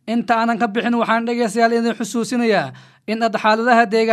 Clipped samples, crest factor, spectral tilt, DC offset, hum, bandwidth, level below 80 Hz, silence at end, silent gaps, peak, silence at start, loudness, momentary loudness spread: under 0.1%; 18 dB; -4.5 dB/octave; under 0.1%; none; 13 kHz; -74 dBFS; 0 s; none; 0 dBFS; 0.05 s; -18 LUFS; 7 LU